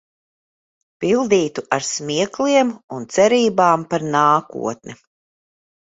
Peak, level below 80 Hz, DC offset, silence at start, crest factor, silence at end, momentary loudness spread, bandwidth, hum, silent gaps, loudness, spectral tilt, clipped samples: -2 dBFS; -62 dBFS; under 0.1%; 1 s; 18 dB; 0.9 s; 12 LU; 8 kHz; none; 2.83-2.88 s; -18 LUFS; -4 dB/octave; under 0.1%